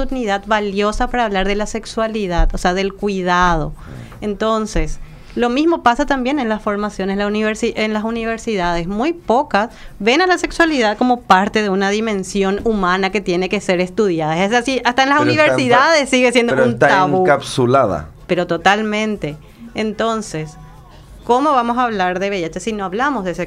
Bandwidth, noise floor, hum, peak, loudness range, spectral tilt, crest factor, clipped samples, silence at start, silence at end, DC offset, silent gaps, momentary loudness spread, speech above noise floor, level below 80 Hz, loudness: 14.5 kHz; -39 dBFS; none; 0 dBFS; 6 LU; -5 dB/octave; 16 dB; under 0.1%; 0 s; 0 s; under 0.1%; none; 10 LU; 23 dB; -30 dBFS; -16 LUFS